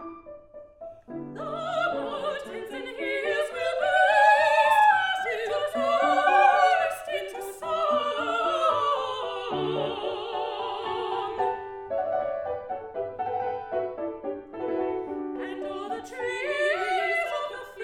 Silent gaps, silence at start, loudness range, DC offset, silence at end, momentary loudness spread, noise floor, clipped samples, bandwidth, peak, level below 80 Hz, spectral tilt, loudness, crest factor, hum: none; 0 s; 10 LU; under 0.1%; 0 s; 16 LU; -46 dBFS; under 0.1%; 16 kHz; -8 dBFS; -64 dBFS; -3.5 dB/octave; -26 LUFS; 20 dB; none